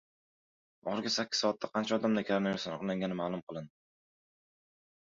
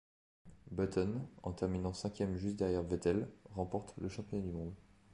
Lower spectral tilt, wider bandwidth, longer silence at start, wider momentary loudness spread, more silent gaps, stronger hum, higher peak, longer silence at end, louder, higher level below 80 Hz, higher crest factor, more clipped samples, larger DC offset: second, -3.5 dB/octave vs -7 dB/octave; second, 7.6 kHz vs 11 kHz; first, 0.85 s vs 0.45 s; first, 13 LU vs 10 LU; first, 3.43-3.47 s vs none; neither; first, -16 dBFS vs -20 dBFS; first, 1.45 s vs 0 s; first, -33 LUFS vs -39 LUFS; second, -74 dBFS vs -54 dBFS; about the same, 20 dB vs 20 dB; neither; neither